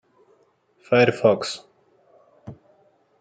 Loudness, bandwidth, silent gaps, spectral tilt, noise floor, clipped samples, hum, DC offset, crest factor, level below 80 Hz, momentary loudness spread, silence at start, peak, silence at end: -20 LUFS; 9.4 kHz; none; -5.5 dB/octave; -62 dBFS; under 0.1%; none; under 0.1%; 22 dB; -68 dBFS; 27 LU; 0.9 s; -4 dBFS; 0.7 s